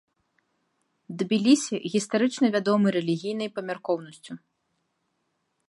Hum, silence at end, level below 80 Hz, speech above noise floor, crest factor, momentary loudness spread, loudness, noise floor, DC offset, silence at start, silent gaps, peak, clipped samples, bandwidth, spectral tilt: none; 1.3 s; -78 dBFS; 51 dB; 20 dB; 20 LU; -25 LUFS; -76 dBFS; under 0.1%; 1.1 s; none; -8 dBFS; under 0.1%; 11.5 kHz; -5 dB/octave